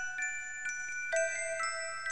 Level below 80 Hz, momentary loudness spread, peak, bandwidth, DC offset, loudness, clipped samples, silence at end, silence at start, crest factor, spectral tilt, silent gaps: -68 dBFS; 5 LU; -20 dBFS; 9.4 kHz; 0.3%; -35 LUFS; under 0.1%; 0 s; 0 s; 16 dB; 1.5 dB/octave; none